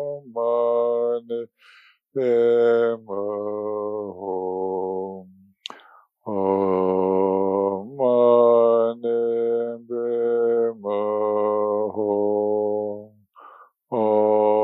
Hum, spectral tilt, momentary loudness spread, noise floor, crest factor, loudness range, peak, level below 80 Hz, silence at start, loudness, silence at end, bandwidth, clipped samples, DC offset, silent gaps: none; -8.5 dB/octave; 13 LU; -53 dBFS; 16 dB; 7 LU; -6 dBFS; -82 dBFS; 0 s; -22 LUFS; 0 s; 4.7 kHz; under 0.1%; under 0.1%; none